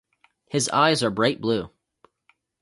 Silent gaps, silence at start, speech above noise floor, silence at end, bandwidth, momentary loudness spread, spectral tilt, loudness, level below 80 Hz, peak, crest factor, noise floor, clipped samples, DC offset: none; 0.55 s; 44 dB; 0.95 s; 11.5 kHz; 9 LU; -4 dB/octave; -22 LUFS; -60 dBFS; -4 dBFS; 20 dB; -66 dBFS; under 0.1%; under 0.1%